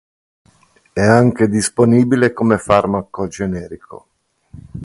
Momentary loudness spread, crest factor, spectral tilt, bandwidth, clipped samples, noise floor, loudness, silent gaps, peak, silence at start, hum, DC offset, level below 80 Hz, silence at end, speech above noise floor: 15 LU; 16 dB; -6 dB/octave; 11.5 kHz; under 0.1%; -54 dBFS; -15 LUFS; none; 0 dBFS; 0.95 s; none; under 0.1%; -44 dBFS; 0 s; 39 dB